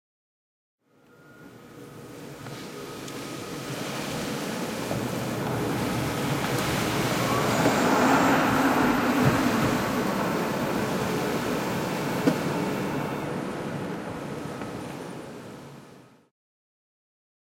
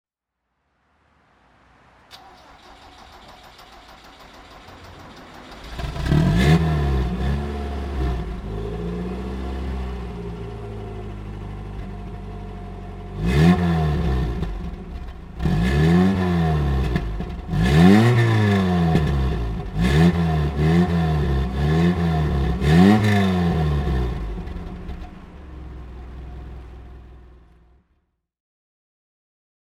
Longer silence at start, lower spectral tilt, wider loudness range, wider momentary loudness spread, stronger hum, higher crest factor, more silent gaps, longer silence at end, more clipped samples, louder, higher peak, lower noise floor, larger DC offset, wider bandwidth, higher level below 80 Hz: second, 1.3 s vs 2.1 s; second, -5 dB/octave vs -7.5 dB/octave; about the same, 16 LU vs 16 LU; second, 17 LU vs 22 LU; neither; about the same, 20 dB vs 20 dB; neither; second, 1.55 s vs 2.55 s; neither; second, -26 LUFS vs -20 LUFS; second, -8 dBFS vs -2 dBFS; second, -56 dBFS vs -79 dBFS; neither; first, 16.5 kHz vs 14 kHz; second, -52 dBFS vs -30 dBFS